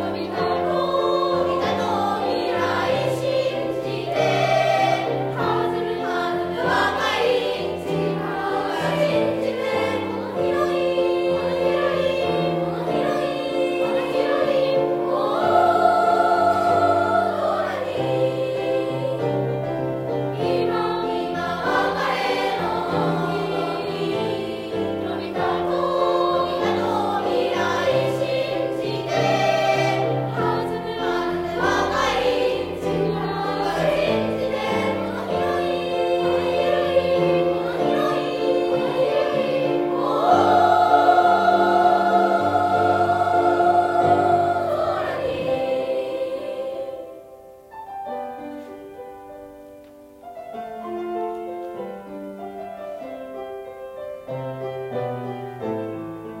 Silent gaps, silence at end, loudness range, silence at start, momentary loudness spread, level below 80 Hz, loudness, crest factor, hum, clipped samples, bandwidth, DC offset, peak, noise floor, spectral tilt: none; 0 s; 14 LU; 0 s; 14 LU; -56 dBFS; -21 LUFS; 18 dB; none; under 0.1%; 16 kHz; under 0.1%; -4 dBFS; -44 dBFS; -6 dB/octave